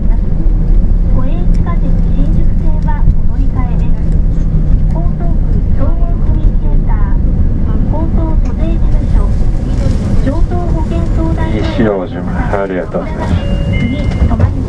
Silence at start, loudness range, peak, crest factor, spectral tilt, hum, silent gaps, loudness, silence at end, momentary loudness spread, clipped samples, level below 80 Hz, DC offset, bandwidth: 0 s; 0 LU; 0 dBFS; 10 dB; -9 dB/octave; none; none; -15 LUFS; 0 s; 2 LU; under 0.1%; -10 dBFS; under 0.1%; 5.6 kHz